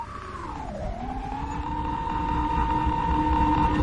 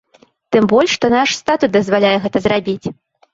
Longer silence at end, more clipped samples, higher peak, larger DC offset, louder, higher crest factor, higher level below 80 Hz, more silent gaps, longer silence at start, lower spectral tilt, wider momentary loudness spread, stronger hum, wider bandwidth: second, 0 s vs 0.4 s; neither; second, -10 dBFS vs 0 dBFS; neither; second, -27 LUFS vs -15 LUFS; about the same, 16 dB vs 16 dB; first, -32 dBFS vs -50 dBFS; neither; second, 0 s vs 0.5 s; first, -7.5 dB/octave vs -4.5 dB/octave; first, 12 LU vs 7 LU; neither; first, 9.8 kHz vs 7.8 kHz